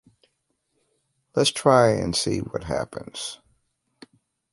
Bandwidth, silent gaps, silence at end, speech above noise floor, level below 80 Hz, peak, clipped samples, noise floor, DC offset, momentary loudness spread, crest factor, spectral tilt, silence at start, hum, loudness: 11.5 kHz; none; 1.15 s; 52 dB; -50 dBFS; -4 dBFS; under 0.1%; -74 dBFS; under 0.1%; 16 LU; 22 dB; -4.5 dB/octave; 1.35 s; none; -23 LUFS